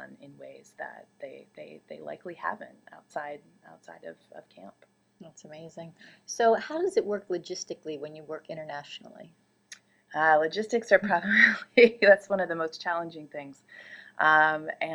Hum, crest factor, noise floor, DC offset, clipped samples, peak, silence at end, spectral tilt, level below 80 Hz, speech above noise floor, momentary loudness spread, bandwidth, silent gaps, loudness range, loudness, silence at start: none; 24 dB; -54 dBFS; under 0.1%; under 0.1%; -4 dBFS; 0 s; -4 dB/octave; -78 dBFS; 25 dB; 26 LU; 11.5 kHz; none; 19 LU; -25 LUFS; 0 s